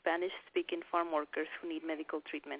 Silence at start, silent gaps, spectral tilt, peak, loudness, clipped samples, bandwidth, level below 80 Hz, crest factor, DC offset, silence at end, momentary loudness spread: 0.05 s; none; -0.5 dB/octave; -18 dBFS; -38 LUFS; under 0.1%; 4 kHz; -82 dBFS; 20 dB; under 0.1%; 0 s; 6 LU